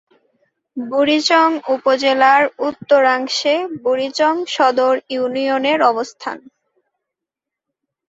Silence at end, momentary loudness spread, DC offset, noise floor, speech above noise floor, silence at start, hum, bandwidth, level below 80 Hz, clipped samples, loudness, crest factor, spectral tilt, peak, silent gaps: 1.7 s; 11 LU; under 0.1%; -84 dBFS; 68 dB; 0.75 s; none; 8 kHz; -68 dBFS; under 0.1%; -16 LUFS; 16 dB; -2.5 dB/octave; -2 dBFS; none